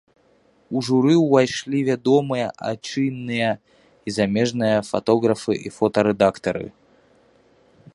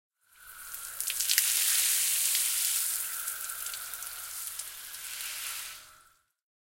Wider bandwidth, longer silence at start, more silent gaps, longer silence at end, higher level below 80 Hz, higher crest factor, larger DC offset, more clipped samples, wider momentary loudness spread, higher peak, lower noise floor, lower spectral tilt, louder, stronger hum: second, 11.5 kHz vs 17 kHz; first, 0.7 s vs 0.4 s; neither; first, 1.25 s vs 0.7 s; first, -58 dBFS vs -70 dBFS; second, 20 dB vs 32 dB; neither; neither; second, 11 LU vs 16 LU; about the same, -2 dBFS vs -2 dBFS; second, -59 dBFS vs -63 dBFS; first, -6 dB/octave vs 4.5 dB/octave; first, -21 LUFS vs -28 LUFS; neither